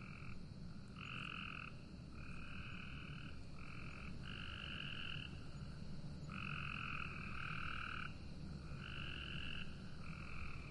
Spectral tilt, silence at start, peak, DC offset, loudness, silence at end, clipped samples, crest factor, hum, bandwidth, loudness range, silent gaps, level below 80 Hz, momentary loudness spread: -5.5 dB/octave; 0 s; -32 dBFS; under 0.1%; -49 LUFS; 0 s; under 0.1%; 16 dB; none; 11 kHz; 4 LU; none; -56 dBFS; 8 LU